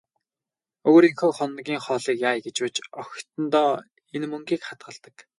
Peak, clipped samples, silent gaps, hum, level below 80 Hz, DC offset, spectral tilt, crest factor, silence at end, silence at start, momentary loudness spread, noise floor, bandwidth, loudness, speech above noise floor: -4 dBFS; under 0.1%; none; none; -76 dBFS; under 0.1%; -4.5 dB/octave; 20 dB; 0.2 s; 0.85 s; 20 LU; under -90 dBFS; 11.5 kHz; -23 LUFS; over 67 dB